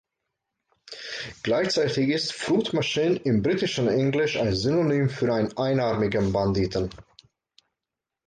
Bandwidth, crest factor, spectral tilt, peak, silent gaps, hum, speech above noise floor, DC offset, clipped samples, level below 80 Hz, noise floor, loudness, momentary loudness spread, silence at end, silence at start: 9.6 kHz; 14 dB; -6 dB/octave; -12 dBFS; none; none; 64 dB; under 0.1%; under 0.1%; -50 dBFS; -87 dBFS; -24 LUFS; 8 LU; 1.25 s; 0.9 s